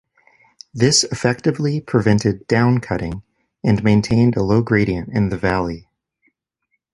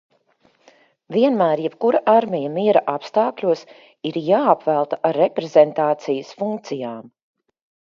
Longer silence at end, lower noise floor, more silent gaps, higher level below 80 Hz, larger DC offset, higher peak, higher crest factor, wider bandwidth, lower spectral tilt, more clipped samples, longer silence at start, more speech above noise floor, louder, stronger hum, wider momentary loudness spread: first, 1.15 s vs 0.75 s; first, -72 dBFS vs -60 dBFS; neither; first, -42 dBFS vs -72 dBFS; neither; about the same, -2 dBFS vs 0 dBFS; about the same, 16 dB vs 20 dB; first, 11.5 kHz vs 7.2 kHz; second, -5.5 dB/octave vs -7 dB/octave; neither; second, 0.75 s vs 1.1 s; first, 55 dB vs 41 dB; about the same, -18 LUFS vs -19 LUFS; neither; about the same, 10 LU vs 11 LU